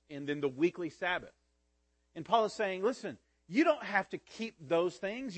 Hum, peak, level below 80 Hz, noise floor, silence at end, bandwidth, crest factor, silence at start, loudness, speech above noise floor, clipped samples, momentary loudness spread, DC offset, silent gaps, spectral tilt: none; -14 dBFS; -74 dBFS; -76 dBFS; 0 s; 8.8 kHz; 22 dB; 0.1 s; -34 LUFS; 42 dB; under 0.1%; 13 LU; under 0.1%; none; -5 dB/octave